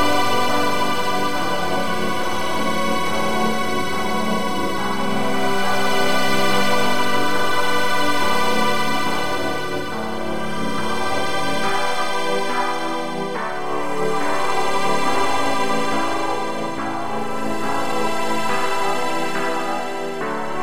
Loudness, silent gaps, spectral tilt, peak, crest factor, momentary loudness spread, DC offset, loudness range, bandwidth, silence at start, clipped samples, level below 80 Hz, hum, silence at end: -21 LUFS; none; -3.5 dB/octave; -4 dBFS; 14 dB; 6 LU; 9%; 3 LU; 16 kHz; 0 s; under 0.1%; -50 dBFS; none; 0 s